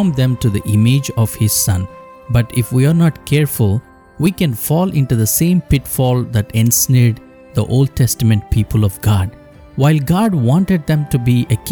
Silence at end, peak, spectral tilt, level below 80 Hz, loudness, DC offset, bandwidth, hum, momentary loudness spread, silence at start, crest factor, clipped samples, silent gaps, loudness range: 0 s; -2 dBFS; -6 dB/octave; -34 dBFS; -15 LUFS; under 0.1%; over 20 kHz; none; 5 LU; 0 s; 12 dB; under 0.1%; none; 1 LU